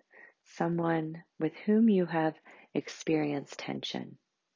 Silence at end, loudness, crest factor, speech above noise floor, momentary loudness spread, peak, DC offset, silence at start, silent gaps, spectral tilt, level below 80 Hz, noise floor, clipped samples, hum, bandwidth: 0.4 s; -31 LUFS; 16 dB; 28 dB; 13 LU; -16 dBFS; under 0.1%; 0.2 s; none; -6.5 dB/octave; -80 dBFS; -58 dBFS; under 0.1%; none; 7.4 kHz